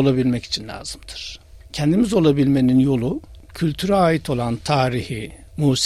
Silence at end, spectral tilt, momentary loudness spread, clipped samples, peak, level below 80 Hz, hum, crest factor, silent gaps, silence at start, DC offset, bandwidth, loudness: 0 s; -6 dB/octave; 16 LU; under 0.1%; -4 dBFS; -42 dBFS; none; 16 dB; none; 0 s; under 0.1%; 13 kHz; -19 LUFS